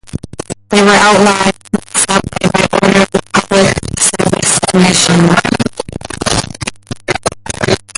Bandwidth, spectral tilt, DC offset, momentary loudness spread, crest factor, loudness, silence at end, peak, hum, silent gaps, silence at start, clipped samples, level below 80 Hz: 11.5 kHz; -3.5 dB/octave; under 0.1%; 15 LU; 12 dB; -10 LUFS; 0.2 s; 0 dBFS; none; none; 0.15 s; under 0.1%; -34 dBFS